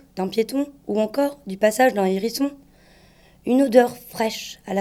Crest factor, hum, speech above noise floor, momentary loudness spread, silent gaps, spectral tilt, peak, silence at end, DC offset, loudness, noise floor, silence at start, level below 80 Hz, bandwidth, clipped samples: 20 dB; none; 32 dB; 10 LU; none; -5 dB/octave; 0 dBFS; 0 s; under 0.1%; -22 LUFS; -52 dBFS; 0.15 s; -60 dBFS; 17 kHz; under 0.1%